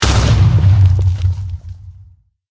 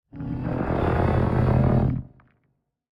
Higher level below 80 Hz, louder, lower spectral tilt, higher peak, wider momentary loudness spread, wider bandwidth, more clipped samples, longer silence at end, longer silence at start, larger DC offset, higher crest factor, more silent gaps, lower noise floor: first, -20 dBFS vs -34 dBFS; first, -13 LUFS vs -23 LUFS; second, -5.5 dB/octave vs -10.5 dB/octave; first, 0 dBFS vs -8 dBFS; first, 17 LU vs 11 LU; first, 8 kHz vs 5.2 kHz; neither; second, 0.6 s vs 0.9 s; second, 0 s vs 0.15 s; neither; about the same, 12 dB vs 16 dB; neither; second, -45 dBFS vs -72 dBFS